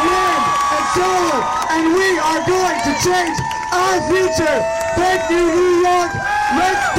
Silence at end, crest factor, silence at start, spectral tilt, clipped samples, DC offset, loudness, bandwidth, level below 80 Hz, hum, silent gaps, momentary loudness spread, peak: 0 s; 8 dB; 0 s; -3.5 dB/octave; under 0.1%; under 0.1%; -16 LUFS; 16.5 kHz; -42 dBFS; none; none; 4 LU; -8 dBFS